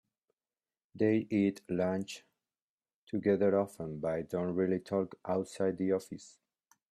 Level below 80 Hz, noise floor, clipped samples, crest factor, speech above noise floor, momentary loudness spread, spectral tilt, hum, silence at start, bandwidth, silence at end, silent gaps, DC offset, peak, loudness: -72 dBFS; under -90 dBFS; under 0.1%; 18 dB; over 58 dB; 10 LU; -7 dB/octave; none; 0.95 s; 14 kHz; 0.65 s; 2.62-2.78 s, 2.94-3.07 s; under 0.1%; -16 dBFS; -33 LUFS